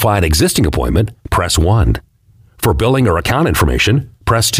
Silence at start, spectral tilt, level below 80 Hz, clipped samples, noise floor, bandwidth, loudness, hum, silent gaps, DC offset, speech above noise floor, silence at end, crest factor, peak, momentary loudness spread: 0 s; -5 dB/octave; -24 dBFS; under 0.1%; -48 dBFS; 16 kHz; -14 LUFS; none; none; under 0.1%; 36 dB; 0 s; 10 dB; -2 dBFS; 5 LU